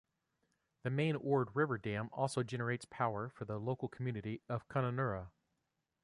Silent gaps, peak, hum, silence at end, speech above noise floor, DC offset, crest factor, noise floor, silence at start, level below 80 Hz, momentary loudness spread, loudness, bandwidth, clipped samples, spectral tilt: none; -20 dBFS; none; 0.75 s; 48 dB; under 0.1%; 18 dB; -86 dBFS; 0.85 s; -68 dBFS; 8 LU; -39 LUFS; 11 kHz; under 0.1%; -7 dB/octave